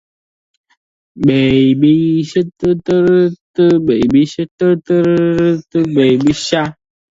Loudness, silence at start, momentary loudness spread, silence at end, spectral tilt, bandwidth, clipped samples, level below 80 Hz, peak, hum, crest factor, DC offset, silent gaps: -13 LUFS; 1.15 s; 6 LU; 0.45 s; -7 dB/octave; 7.8 kHz; under 0.1%; -46 dBFS; 0 dBFS; none; 12 dB; under 0.1%; 3.41-3.54 s, 4.51-4.58 s